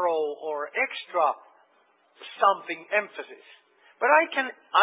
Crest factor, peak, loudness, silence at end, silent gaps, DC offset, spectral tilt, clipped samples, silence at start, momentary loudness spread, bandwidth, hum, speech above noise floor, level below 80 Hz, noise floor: 22 dB; -6 dBFS; -25 LUFS; 0 s; none; under 0.1%; -5.5 dB/octave; under 0.1%; 0 s; 19 LU; 4 kHz; none; 39 dB; under -90 dBFS; -64 dBFS